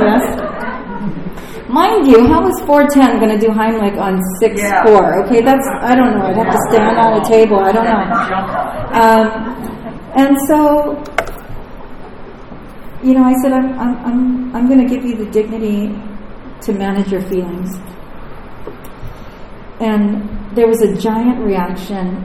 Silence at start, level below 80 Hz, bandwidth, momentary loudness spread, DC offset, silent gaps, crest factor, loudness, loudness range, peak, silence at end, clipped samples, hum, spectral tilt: 0 s; -34 dBFS; 16.5 kHz; 22 LU; under 0.1%; none; 12 dB; -13 LUFS; 10 LU; 0 dBFS; 0 s; 0.4%; none; -6 dB/octave